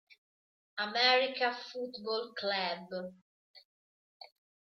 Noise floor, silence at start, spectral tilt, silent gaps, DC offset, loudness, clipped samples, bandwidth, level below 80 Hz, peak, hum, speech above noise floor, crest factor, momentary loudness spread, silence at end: under -90 dBFS; 0.75 s; -3 dB/octave; 3.22-3.54 s, 3.65-4.20 s; under 0.1%; -32 LUFS; under 0.1%; 6.6 kHz; -86 dBFS; -12 dBFS; none; over 57 dB; 24 dB; 16 LU; 0.45 s